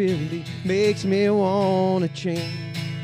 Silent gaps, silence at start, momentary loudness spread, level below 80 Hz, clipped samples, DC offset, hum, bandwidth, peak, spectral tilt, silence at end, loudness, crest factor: none; 0 s; 10 LU; -64 dBFS; under 0.1%; under 0.1%; none; 14.5 kHz; -10 dBFS; -6.5 dB/octave; 0 s; -23 LUFS; 14 dB